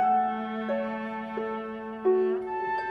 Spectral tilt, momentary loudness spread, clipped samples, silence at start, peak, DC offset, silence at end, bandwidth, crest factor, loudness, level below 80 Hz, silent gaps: -7.5 dB/octave; 9 LU; under 0.1%; 0 s; -16 dBFS; under 0.1%; 0 s; 5.2 kHz; 12 dB; -29 LUFS; -66 dBFS; none